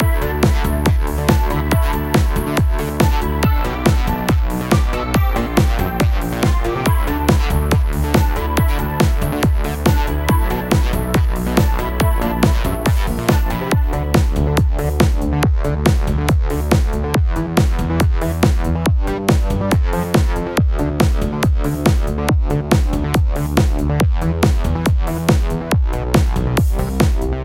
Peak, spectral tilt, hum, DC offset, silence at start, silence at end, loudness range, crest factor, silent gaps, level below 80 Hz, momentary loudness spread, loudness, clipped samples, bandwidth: 0 dBFS; -6.5 dB/octave; none; under 0.1%; 0 s; 0 s; 0 LU; 16 dB; none; -18 dBFS; 2 LU; -17 LUFS; under 0.1%; 17 kHz